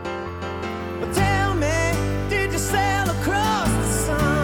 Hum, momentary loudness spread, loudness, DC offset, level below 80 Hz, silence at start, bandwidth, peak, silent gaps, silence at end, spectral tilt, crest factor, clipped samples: none; 9 LU; -22 LUFS; under 0.1%; -32 dBFS; 0 s; 18 kHz; -8 dBFS; none; 0 s; -4.5 dB/octave; 14 dB; under 0.1%